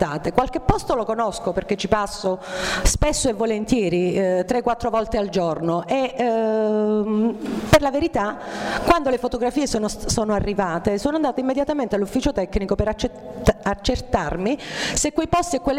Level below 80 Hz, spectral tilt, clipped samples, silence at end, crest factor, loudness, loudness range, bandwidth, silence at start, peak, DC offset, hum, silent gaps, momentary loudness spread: -34 dBFS; -4.5 dB/octave; under 0.1%; 0 s; 16 dB; -22 LUFS; 2 LU; 16 kHz; 0 s; -4 dBFS; under 0.1%; none; none; 5 LU